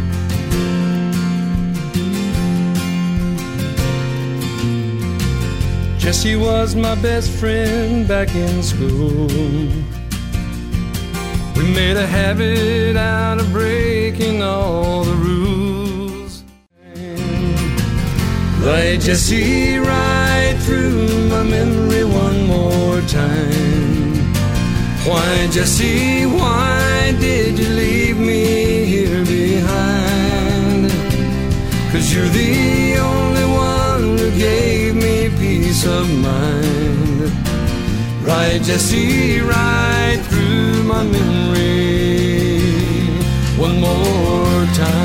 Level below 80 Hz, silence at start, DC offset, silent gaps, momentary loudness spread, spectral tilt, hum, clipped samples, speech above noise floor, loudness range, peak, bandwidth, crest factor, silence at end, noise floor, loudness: -26 dBFS; 0 s; under 0.1%; none; 5 LU; -5.5 dB/octave; none; under 0.1%; 28 dB; 4 LU; -2 dBFS; 16.5 kHz; 12 dB; 0 s; -43 dBFS; -16 LUFS